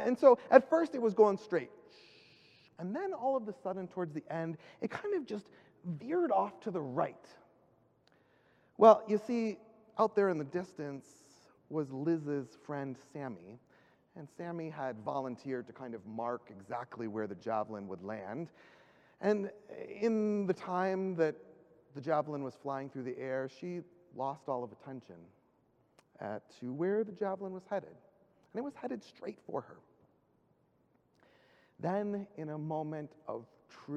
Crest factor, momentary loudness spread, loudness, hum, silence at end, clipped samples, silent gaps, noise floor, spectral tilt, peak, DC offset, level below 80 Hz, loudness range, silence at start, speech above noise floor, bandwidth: 28 dB; 17 LU; -35 LUFS; none; 0 s; under 0.1%; none; -72 dBFS; -7.5 dB/octave; -8 dBFS; under 0.1%; -84 dBFS; 12 LU; 0 s; 38 dB; 9.6 kHz